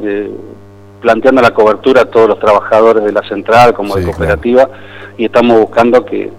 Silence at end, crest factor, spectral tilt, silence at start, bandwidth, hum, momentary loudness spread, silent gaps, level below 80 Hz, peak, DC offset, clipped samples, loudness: 0 s; 10 dB; -6.5 dB/octave; 0 s; 15 kHz; 50 Hz at -35 dBFS; 11 LU; none; -36 dBFS; 0 dBFS; under 0.1%; 0.7%; -9 LUFS